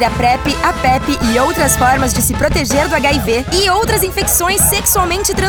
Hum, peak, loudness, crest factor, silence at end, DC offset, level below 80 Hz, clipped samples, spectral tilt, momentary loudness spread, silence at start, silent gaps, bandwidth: none; 0 dBFS; -12 LUFS; 12 dB; 0 s; under 0.1%; -26 dBFS; under 0.1%; -3 dB/octave; 4 LU; 0 s; none; over 20 kHz